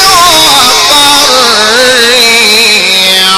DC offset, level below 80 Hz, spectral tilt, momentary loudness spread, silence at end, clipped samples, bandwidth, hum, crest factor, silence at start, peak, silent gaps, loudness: 0.5%; -36 dBFS; 0 dB/octave; 2 LU; 0 s; 7%; over 20 kHz; none; 4 dB; 0 s; 0 dBFS; none; -2 LUFS